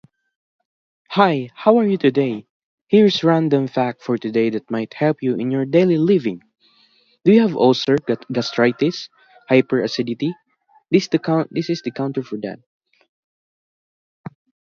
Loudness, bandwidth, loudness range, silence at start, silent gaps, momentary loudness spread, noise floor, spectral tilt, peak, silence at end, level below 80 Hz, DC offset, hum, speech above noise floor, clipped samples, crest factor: -18 LUFS; 7.2 kHz; 6 LU; 1.1 s; 2.50-2.85 s; 14 LU; -58 dBFS; -7 dB/octave; 0 dBFS; 2.2 s; -66 dBFS; under 0.1%; none; 41 dB; under 0.1%; 18 dB